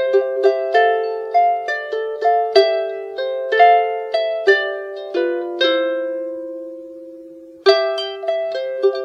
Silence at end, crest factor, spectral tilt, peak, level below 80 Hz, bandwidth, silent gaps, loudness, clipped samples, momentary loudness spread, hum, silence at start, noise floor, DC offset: 0 s; 18 dB; -2.5 dB/octave; 0 dBFS; -74 dBFS; 7.8 kHz; none; -18 LUFS; under 0.1%; 14 LU; none; 0 s; -39 dBFS; under 0.1%